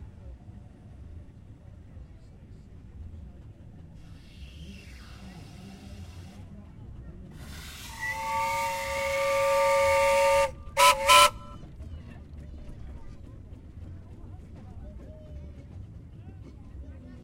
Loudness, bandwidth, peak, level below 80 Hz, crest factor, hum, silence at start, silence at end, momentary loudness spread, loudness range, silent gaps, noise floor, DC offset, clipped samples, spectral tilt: -23 LUFS; 16 kHz; -4 dBFS; -48 dBFS; 28 dB; none; 0 s; 0 s; 27 LU; 26 LU; none; -48 dBFS; under 0.1%; under 0.1%; -2 dB/octave